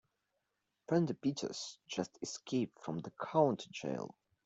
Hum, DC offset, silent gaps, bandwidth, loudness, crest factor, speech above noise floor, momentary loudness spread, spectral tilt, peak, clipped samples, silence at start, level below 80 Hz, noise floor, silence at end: none; under 0.1%; none; 8.2 kHz; -38 LUFS; 22 dB; 48 dB; 12 LU; -5.5 dB/octave; -16 dBFS; under 0.1%; 0.9 s; -78 dBFS; -85 dBFS; 0.4 s